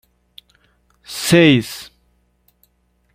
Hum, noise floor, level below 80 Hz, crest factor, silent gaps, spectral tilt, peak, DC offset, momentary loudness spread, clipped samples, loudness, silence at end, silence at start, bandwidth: 60 Hz at -45 dBFS; -62 dBFS; -52 dBFS; 18 dB; none; -5 dB/octave; -2 dBFS; under 0.1%; 20 LU; under 0.1%; -14 LUFS; 1.3 s; 1.1 s; 16 kHz